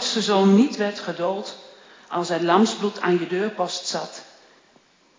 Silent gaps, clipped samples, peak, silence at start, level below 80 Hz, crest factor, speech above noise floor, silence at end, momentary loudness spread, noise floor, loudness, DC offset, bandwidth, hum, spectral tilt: none; under 0.1%; -4 dBFS; 0 s; -80 dBFS; 18 dB; 36 dB; 0.95 s; 15 LU; -58 dBFS; -22 LUFS; under 0.1%; 7.6 kHz; none; -5 dB/octave